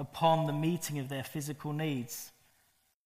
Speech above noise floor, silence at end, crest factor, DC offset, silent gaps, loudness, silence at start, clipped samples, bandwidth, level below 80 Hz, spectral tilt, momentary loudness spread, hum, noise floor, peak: 39 dB; 0.75 s; 20 dB; under 0.1%; none; -34 LUFS; 0 s; under 0.1%; 15.5 kHz; -70 dBFS; -5.5 dB/octave; 13 LU; none; -72 dBFS; -14 dBFS